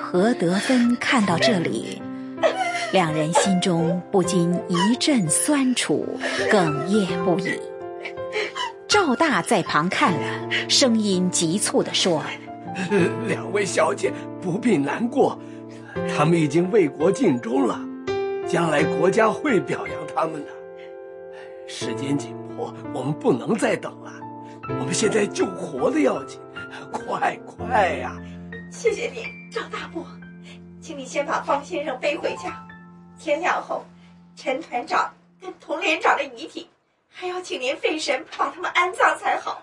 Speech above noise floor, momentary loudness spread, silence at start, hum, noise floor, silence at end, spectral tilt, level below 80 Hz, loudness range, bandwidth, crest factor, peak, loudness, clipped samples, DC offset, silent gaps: 22 dB; 17 LU; 0 s; none; -44 dBFS; 0 s; -4.5 dB/octave; -64 dBFS; 7 LU; 11.5 kHz; 20 dB; -4 dBFS; -22 LUFS; under 0.1%; under 0.1%; none